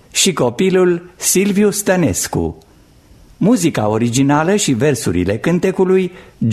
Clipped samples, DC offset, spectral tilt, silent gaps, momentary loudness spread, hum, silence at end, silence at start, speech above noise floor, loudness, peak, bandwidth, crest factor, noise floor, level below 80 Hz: under 0.1%; under 0.1%; -4.5 dB/octave; none; 5 LU; none; 0 s; 0.15 s; 31 dB; -15 LUFS; 0 dBFS; 13.5 kHz; 14 dB; -46 dBFS; -44 dBFS